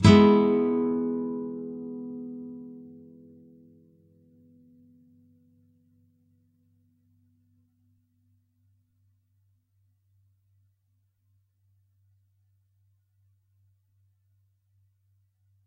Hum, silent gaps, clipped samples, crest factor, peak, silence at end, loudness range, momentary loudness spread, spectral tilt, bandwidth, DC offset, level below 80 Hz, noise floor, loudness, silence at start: none; none; under 0.1%; 26 dB; -4 dBFS; 12.8 s; 29 LU; 27 LU; -7.5 dB/octave; 10 kHz; under 0.1%; -56 dBFS; -72 dBFS; -25 LUFS; 0 s